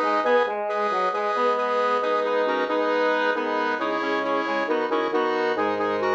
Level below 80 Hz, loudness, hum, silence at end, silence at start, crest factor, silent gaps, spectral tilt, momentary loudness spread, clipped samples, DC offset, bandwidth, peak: -74 dBFS; -23 LUFS; none; 0 s; 0 s; 14 dB; none; -4.5 dB/octave; 3 LU; under 0.1%; under 0.1%; 7.8 kHz; -10 dBFS